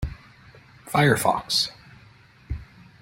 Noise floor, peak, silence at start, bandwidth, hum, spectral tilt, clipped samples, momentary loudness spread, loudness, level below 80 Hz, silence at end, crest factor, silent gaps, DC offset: -52 dBFS; -4 dBFS; 0 s; 16.5 kHz; none; -4 dB/octave; under 0.1%; 18 LU; -22 LUFS; -42 dBFS; 0.35 s; 22 dB; none; under 0.1%